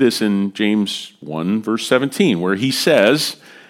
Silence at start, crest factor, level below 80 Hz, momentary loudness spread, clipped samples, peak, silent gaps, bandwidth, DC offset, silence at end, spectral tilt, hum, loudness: 0 s; 18 dB; -66 dBFS; 10 LU; under 0.1%; 0 dBFS; none; 16.5 kHz; under 0.1%; 0.35 s; -4.5 dB/octave; none; -17 LUFS